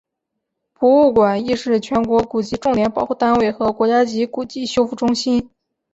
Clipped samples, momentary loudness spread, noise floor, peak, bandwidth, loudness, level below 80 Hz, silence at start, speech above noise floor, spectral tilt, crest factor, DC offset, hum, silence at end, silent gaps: under 0.1%; 8 LU; -78 dBFS; -2 dBFS; 8 kHz; -17 LUFS; -48 dBFS; 0.8 s; 62 dB; -5.5 dB/octave; 16 dB; under 0.1%; none; 0.45 s; none